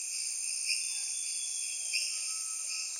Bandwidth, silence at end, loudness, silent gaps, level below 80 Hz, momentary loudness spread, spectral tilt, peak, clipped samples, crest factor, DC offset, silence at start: 16.5 kHz; 0 s; -32 LUFS; none; under -90 dBFS; 3 LU; 8 dB/octave; -16 dBFS; under 0.1%; 20 dB; under 0.1%; 0 s